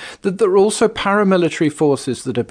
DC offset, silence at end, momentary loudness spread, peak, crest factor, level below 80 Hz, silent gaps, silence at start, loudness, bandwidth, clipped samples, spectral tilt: under 0.1%; 0.05 s; 8 LU; -4 dBFS; 14 dB; -52 dBFS; none; 0 s; -16 LUFS; 10 kHz; under 0.1%; -5.5 dB/octave